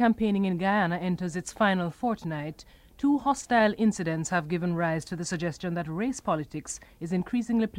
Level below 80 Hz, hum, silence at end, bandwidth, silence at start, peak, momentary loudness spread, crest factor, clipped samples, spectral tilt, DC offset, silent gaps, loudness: -56 dBFS; none; 0 s; 15 kHz; 0 s; -10 dBFS; 9 LU; 18 dB; under 0.1%; -5.5 dB/octave; under 0.1%; none; -28 LUFS